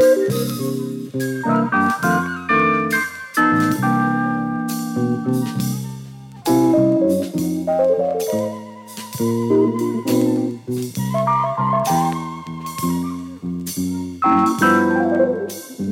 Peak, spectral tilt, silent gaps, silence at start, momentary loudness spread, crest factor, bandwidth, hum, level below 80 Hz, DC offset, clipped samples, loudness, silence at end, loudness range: -4 dBFS; -6 dB/octave; none; 0 s; 12 LU; 14 dB; 17.5 kHz; none; -56 dBFS; under 0.1%; under 0.1%; -19 LUFS; 0 s; 3 LU